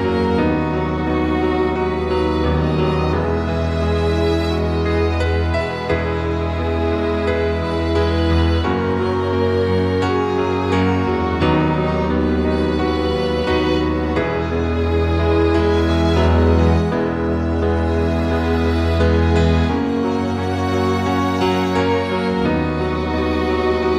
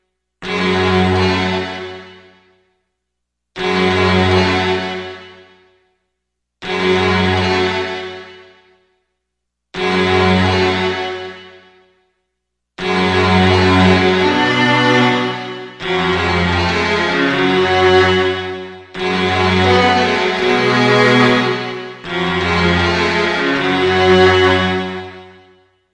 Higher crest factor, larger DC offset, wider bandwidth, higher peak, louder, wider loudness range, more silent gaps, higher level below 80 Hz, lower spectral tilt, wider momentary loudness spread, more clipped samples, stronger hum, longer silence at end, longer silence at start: about the same, 14 dB vs 14 dB; first, 0.4% vs under 0.1%; second, 9.4 kHz vs 11 kHz; about the same, -2 dBFS vs 0 dBFS; second, -18 LUFS vs -14 LUFS; second, 2 LU vs 5 LU; neither; first, -26 dBFS vs -48 dBFS; first, -7.5 dB/octave vs -5.5 dB/octave; second, 4 LU vs 15 LU; neither; second, none vs 60 Hz at -55 dBFS; second, 0 s vs 0.65 s; second, 0 s vs 0.4 s